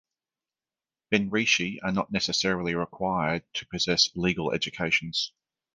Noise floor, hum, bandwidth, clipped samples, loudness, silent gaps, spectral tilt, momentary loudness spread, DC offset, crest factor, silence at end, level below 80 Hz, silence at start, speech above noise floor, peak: under -90 dBFS; none; 10 kHz; under 0.1%; -26 LUFS; none; -3.5 dB/octave; 7 LU; under 0.1%; 22 dB; 0.5 s; -56 dBFS; 1.1 s; over 63 dB; -6 dBFS